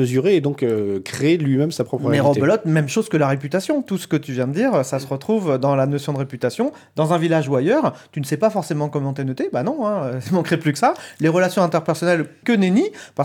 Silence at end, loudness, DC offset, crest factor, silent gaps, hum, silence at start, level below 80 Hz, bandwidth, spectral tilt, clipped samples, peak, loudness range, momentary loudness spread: 0 s; -20 LUFS; under 0.1%; 16 dB; none; none; 0 s; -66 dBFS; 17.5 kHz; -6.5 dB/octave; under 0.1%; -4 dBFS; 2 LU; 7 LU